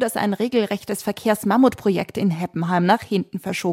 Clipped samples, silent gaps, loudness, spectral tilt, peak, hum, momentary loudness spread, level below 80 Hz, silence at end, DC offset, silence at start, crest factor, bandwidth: under 0.1%; none; -21 LUFS; -6 dB/octave; -4 dBFS; none; 8 LU; -60 dBFS; 0 s; under 0.1%; 0 s; 16 dB; 16.5 kHz